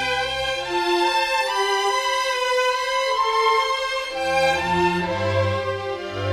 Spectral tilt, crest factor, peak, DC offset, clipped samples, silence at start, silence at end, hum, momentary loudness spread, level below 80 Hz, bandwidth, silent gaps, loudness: -3.5 dB/octave; 14 dB; -8 dBFS; under 0.1%; under 0.1%; 0 s; 0 s; none; 5 LU; -50 dBFS; 16 kHz; none; -21 LUFS